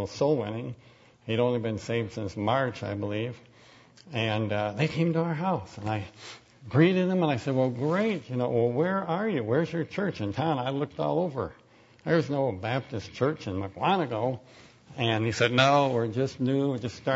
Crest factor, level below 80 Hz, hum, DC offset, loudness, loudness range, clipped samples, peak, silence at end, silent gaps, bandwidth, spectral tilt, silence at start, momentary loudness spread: 22 dB; -62 dBFS; none; under 0.1%; -28 LUFS; 4 LU; under 0.1%; -6 dBFS; 0 s; none; 8 kHz; -6.5 dB/octave; 0 s; 12 LU